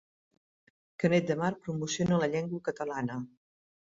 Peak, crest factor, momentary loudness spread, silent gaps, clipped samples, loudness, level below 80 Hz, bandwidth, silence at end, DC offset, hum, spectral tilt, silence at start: -12 dBFS; 20 dB; 9 LU; none; under 0.1%; -31 LUFS; -66 dBFS; 7.8 kHz; 0.6 s; under 0.1%; none; -6 dB/octave; 1 s